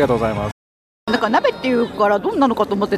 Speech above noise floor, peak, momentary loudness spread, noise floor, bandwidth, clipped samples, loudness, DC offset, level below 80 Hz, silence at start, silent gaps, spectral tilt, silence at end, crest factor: over 73 dB; -4 dBFS; 8 LU; under -90 dBFS; 14 kHz; under 0.1%; -18 LUFS; under 0.1%; -44 dBFS; 0 s; 0.52-1.07 s; -6.5 dB/octave; 0 s; 14 dB